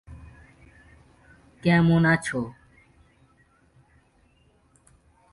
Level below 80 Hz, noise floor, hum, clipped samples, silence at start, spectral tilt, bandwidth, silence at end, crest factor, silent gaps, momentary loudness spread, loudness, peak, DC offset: -54 dBFS; -62 dBFS; none; under 0.1%; 0.1 s; -7 dB/octave; 11.5 kHz; 2.8 s; 18 dB; none; 25 LU; -22 LUFS; -10 dBFS; under 0.1%